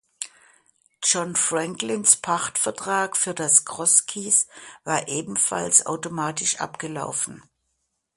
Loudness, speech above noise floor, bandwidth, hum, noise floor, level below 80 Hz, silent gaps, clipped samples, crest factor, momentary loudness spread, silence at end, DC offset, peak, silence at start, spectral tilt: -21 LUFS; 52 dB; 12 kHz; none; -75 dBFS; -68 dBFS; none; under 0.1%; 24 dB; 13 LU; 0.75 s; under 0.1%; 0 dBFS; 0.2 s; -1.5 dB/octave